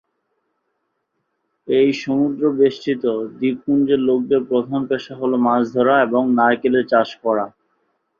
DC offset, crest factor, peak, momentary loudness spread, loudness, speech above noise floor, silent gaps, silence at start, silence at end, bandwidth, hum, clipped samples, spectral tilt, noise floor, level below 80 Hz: under 0.1%; 16 dB; -2 dBFS; 6 LU; -18 LUFS; 55 dB; none; 1.65 s; 0.7 s; 7 kHz; none; under 0.1%; -7 dB/octave; -72 dBFS; -62 dBFS